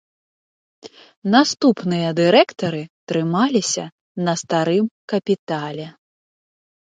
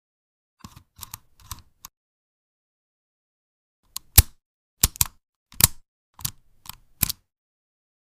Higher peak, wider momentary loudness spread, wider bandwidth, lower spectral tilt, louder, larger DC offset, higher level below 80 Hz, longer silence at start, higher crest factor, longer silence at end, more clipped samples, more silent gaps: about the same, 0 dBFS vs 0 dBFS; second, 14 LU vs 26 LU; second, 9.4 kHz vs 16 kHz; first, -5 dB/octave vs -2 dB/octave; first, -19 LUFS vs -22 LUFS; neither; second, -68 dBFS vs -36 dBFS; second, 0.85 s vs 4.15 s; second, 20 dB vs 28 dB; about the same, 0.95 s vs 0.9 s; neither; about the same, 1.17-1.22 s, 2.90-3.07 s, 3.92-4.15 s, 4.91-5.08 s, 5.39-5.47 s vs 4.46-4.77 s, 5.29-5.46 s, 5.88-6.13 s